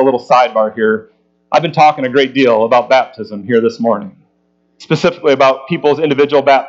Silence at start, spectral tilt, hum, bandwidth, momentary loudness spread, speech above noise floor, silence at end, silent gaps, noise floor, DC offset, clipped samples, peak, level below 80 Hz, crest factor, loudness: 0 s; -6 dB/octave; none; 7.6 kHz; 7 LU; 47 dB; 0 s; none; -59 dBFS; under 0.1%; under 0.1%; 0 dBFS; -60 dBFS; 12 dB; -12 LUFS